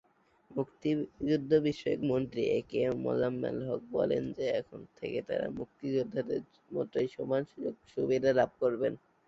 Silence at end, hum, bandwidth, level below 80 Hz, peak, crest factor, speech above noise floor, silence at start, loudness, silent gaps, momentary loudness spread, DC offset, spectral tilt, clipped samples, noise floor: 0.3 s; none; 7.6 kHz; -64 dBFS; -14 dBFS; 18 dB; 31 dB; 0.5 s; -33 LUFS; none; 10 LU; under 0.1%; -7.5 dB/octave; under 0.1%; -63 dBFS